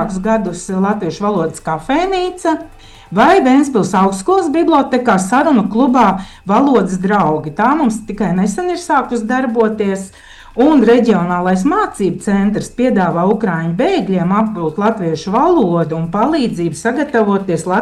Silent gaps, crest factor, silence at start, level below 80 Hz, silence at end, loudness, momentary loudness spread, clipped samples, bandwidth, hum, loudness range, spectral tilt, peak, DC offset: none; 12 dB; 0 s; -42 dBFS; 0 s; -14 LUFS; 7 LU; under 0.1%; 12.5 kHz; none; 3 LU; -6.5 dB/octave; -2 dBFS; under 0.1%